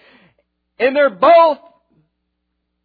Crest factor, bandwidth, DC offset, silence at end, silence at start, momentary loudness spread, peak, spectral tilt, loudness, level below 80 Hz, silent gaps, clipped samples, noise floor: 16 dB; 4.9 kHz; under 0.1%; 1.3 s; 0.8 s; 9 LU; 0 dBFS; -7 dB/octave; -13 LUFS; -62 dBFS; none; under 0.1%; -72 dBFS